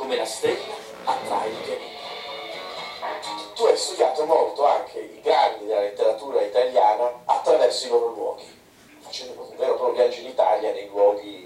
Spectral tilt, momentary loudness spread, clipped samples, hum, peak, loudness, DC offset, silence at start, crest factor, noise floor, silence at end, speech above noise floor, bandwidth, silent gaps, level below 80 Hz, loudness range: -2 dB/octave; 14 LU; under 0.1%; none; -4 dBFS; -23 LUFS; under 0.1%; 0 s; 18 dB; -50 dBFS; 0 s; 28 dB; 15 kHz; none; -70 dBFS; 6 LU